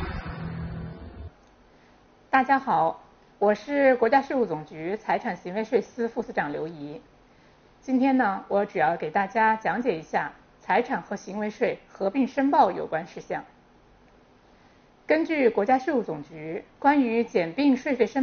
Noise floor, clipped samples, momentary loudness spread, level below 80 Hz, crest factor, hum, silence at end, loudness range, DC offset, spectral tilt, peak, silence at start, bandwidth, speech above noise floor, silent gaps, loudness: -56 dBFS; under 0.1%; 14 LU; -52 dBFS; 20 dB; none; 0 s; 4 LU; under 0.1%; -4.5 dB/octave; -6 dBFS; 0 s; 6.8 kHz; 32 dB; none; -25 LUFS